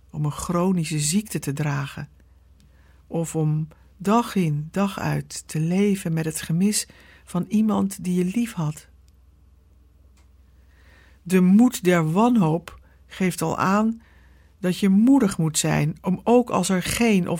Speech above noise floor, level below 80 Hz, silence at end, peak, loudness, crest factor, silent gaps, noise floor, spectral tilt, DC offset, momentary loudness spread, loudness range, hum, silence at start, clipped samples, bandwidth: 33 dB; -52 dBFS; 0 s; -6 dBFS; -22 LUFS; 16 dB; none; -54 dBFS; -5.5 dB/octave; under 0.1%; 12 LU; 6 LU; none; 0.15 s; under 0.1%; 17 kHz